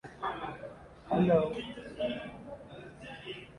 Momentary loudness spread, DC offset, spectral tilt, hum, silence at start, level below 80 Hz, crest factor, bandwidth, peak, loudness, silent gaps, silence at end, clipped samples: 20 LU; under 0.1%; -7.5 dB/octave; none; 0.05 s; -60 dBFS; 20 dB; 11 kHz; -14 dBFS; -33 LUFS; none; 0 s; under 0.1%